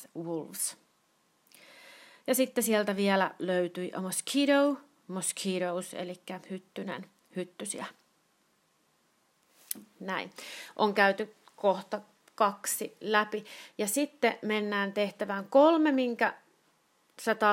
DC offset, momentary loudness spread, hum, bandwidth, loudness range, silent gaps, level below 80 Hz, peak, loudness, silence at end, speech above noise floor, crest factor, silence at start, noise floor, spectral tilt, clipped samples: under 0.1%; 16 LU; none; 16 kHz; 13 LU; none; -88 dBFS; -8 dBFS; -30 LUFS; 0 s; 41 dB; 24 dB; 0 s; -71 dBFS; -3.5 dB/octave; under 0.1%